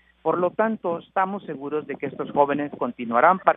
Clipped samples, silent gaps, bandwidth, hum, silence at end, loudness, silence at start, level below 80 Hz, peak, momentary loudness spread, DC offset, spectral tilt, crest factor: under 0.1%; none; 3.9 kHz; none; 0 s; -24 LUFS; 0.25 s; -68 dBFS; 0 dBFS; 11 LU; under 0.1%; -10.5 dB/octave; 22 dB